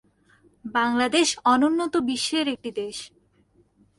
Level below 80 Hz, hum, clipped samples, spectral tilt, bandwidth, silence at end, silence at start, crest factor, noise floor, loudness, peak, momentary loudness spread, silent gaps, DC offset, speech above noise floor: -64 dBFS; none; under 0.1%; -2 dB/octave; 11.5 kHz; 0.9 s; 0.65 s; 18 dB; -62 dBFS; -23 LUFS; -8 dBFS; 15 LU; none; under 0.1%; 39 dB